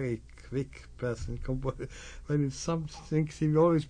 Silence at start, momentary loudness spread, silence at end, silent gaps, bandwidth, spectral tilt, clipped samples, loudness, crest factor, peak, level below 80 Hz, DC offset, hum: 0 s; 14 LU; 0 s; none; 10 kHz; -7 dB/octave; under 0.1%; -32 LUFS; 16 dB; -16 dBFS; -46 dBFS; under 0.1%; none